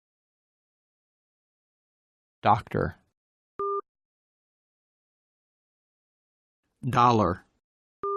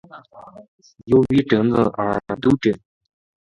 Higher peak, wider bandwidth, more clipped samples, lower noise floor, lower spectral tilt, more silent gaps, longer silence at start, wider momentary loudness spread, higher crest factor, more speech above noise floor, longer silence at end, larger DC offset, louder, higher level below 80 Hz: second, -8 dBFS vs -2 dBFS; first, 12 kHz vs 10.5 kHz; neither; first, under -90 dBFS vs -43 dBFS; about the same, -7 dB/octave vs -8 dB/octave; first, 3.17-3.59 s, 3.89-3.95 s, 4.05-6.63 s, 7.64-8.03 s vs 0.68-0.79 s; first, 2.45 s vs 0.15 s; first, 15 LU vs 7 LU; first, 24 dB vs 18 dB; first, over 67 dB vs 25 dB; second, 0 s vs 0.65 s; neither; second, -26 LUFS vs -19 LUFS; second, -60 dBFS vs -48 dBFS